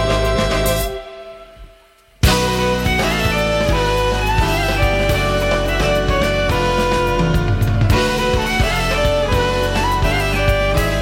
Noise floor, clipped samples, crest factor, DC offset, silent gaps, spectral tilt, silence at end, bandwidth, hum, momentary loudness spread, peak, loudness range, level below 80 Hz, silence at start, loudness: -49 dBFS; under 0.1%; 14 dB; under 0.1%; none; -5 dB/octave; 0 s; 17 kHz; none; 2 LU; -2 dBFS; 2 LU; -22 dBFS; 0 s; -17 LUFS